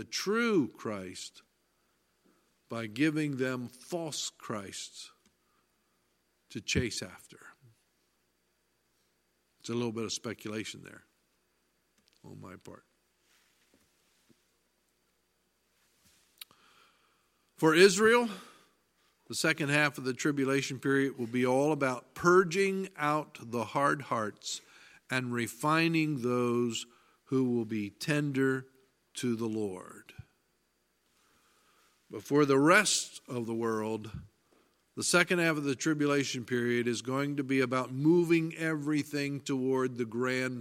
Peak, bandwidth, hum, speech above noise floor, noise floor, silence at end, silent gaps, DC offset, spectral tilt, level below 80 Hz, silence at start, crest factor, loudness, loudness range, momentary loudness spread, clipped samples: -8 dBFS; 16.5 kHz; 60 Hz at -65 dBFS; 45 dB; -76 dBFS; 0 s; none; under 0.1%; -4.5 dB/octave; -68 dBFS; 0 s; 24 dB; -30 LUFS; 11 LU; 19 LU; under 0.1%